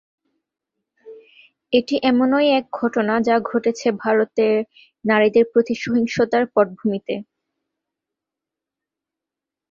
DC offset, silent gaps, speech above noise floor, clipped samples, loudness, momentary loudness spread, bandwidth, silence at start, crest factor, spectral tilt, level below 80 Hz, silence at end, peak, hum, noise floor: under 0.1%; none; 68 dB; under 0.1%; -19 LUFS; 8 LU; 7.4 kHz; 1.05 s; 18 dB; -5.5 dB/octave; -64 dBFS; 2.5 s; -2 dBFS; none; -87 dBFS